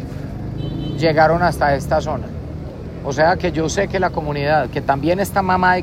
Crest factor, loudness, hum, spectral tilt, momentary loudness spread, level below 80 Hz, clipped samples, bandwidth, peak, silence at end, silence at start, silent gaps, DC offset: 18 dB; -18 LUFS; none; -6 dB/octave; 14 LU; -34 dBFS; under 0.1%; 16 kHz; 0 dBFS; 0 s; 0 s; none; under 0.1%